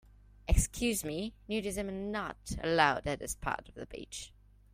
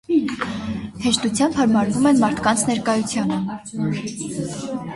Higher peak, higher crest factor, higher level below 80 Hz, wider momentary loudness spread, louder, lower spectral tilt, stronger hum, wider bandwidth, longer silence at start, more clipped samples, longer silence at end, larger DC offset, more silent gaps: second, -12 dBFS vs -4 dBFS; first, 22 dB vs 16 dB; first, -42 dBFS vs -50 dBFS; first, 17 LU vs 11 LU; second, -34 LUFS vs -21 LUFS; about the same, -4 dB/octave vs -4.5 dB/octave; neither; first, 16 kHz vs 11.5 kHz; first, 0.45 s vs 0.1 s; neither; first, 0.45 s vs 0 s; neither; neither